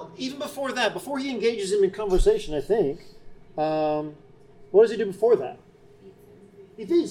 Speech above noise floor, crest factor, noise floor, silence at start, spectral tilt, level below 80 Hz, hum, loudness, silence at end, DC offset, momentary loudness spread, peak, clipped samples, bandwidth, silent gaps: 27 dB; 18 dB; -50 dBFS; 0 s; -5 dB/octave; -38 dBFS; none; -24 LUFS; 0 s; under 0.1%; 12 LU; -6 dBFS; under 0.1%; 16.5 kHz; none